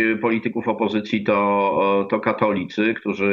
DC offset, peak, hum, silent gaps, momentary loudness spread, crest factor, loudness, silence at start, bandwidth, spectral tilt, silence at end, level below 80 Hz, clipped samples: under 0.1%; -4 dBFS; none; none; 4 LU; 16 dB; -21 LUFS; 0 s; 7 kHz; -7.5 dB/octave; 0 s; -66 dBFS; under 0.1%